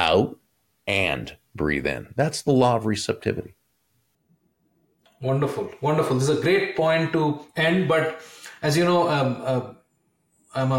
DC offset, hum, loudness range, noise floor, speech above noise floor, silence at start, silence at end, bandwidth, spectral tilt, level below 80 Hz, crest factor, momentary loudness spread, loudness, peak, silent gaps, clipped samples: under 0.1%; none; 5 LU; -70 dBFS; 47 dB; 0 s; 0 s; 16.5 kHz; -5.5 dB/octave; -54 dBFS; 18 dB; 11 LU; -23 LUFS; -6 dBFS; none; under 0.1%